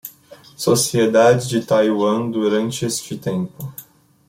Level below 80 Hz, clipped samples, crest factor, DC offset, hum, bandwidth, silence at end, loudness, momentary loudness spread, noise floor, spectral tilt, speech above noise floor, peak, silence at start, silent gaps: -58 dBFS; under 0.1%; 16 dB; under 0.1%; none; 16.5 kHz; 0.45 s; -18 LUFS; 17 LU; -45 dBFS; -4.5 dB/octave; 28 dB; -2 dBFS; 0.05 s; none